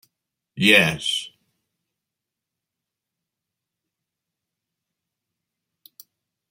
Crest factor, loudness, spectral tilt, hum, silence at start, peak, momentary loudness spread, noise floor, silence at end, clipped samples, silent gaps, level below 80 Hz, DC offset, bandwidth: 26 dB; -18 LUFS; -3.5 dB/octave; none; 0.55 s; -2 dBFS; 14 LU; -85 dBFS; 5.25 s; under 0.1%; none; -66 dBFS; under 0.1%; 16 kHz